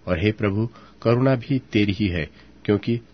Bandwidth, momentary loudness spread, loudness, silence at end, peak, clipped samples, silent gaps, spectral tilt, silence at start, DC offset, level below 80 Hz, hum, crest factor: 6.4 kHz; 9 LU; -23 LUFS; 0.1 s; -4 dBFS; under 0.1%; none; -8.5 dB/octave; 0.05 s; 0.2%; -46 dBFS; none; 18 dB